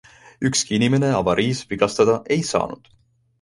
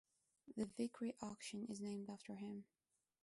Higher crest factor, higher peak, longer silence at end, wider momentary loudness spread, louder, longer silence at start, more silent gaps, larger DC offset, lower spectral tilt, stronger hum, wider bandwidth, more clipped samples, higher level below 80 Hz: about the same, 18 dB vs 18 dB; first, -2 dBFS vs -32 dBFS; about the same, 0.65 s vs 0.6 s; about the same, 7 LU vs 7 LU; first, -20 LUFS vs -49 LUFS; about the same, 0.4 s vs 0.45 s; neither; neither; about the same, -4.5 dB/octave vs -5 dB/octave; neither; about the same, 11.5 kHz vs 11.5 kHz; neither; first, -50 dBFS vs -84 dBFS